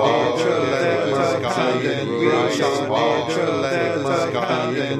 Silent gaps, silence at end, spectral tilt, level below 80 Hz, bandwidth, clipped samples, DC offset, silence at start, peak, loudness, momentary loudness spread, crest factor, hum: none; 0 s; -5 dB/octave; -58 dBFS; 13.5 kHz; under 0.1%; under 0.1%; 0 s; -4 dBFS; -20 LUFS; 3 LU; 14 dB; none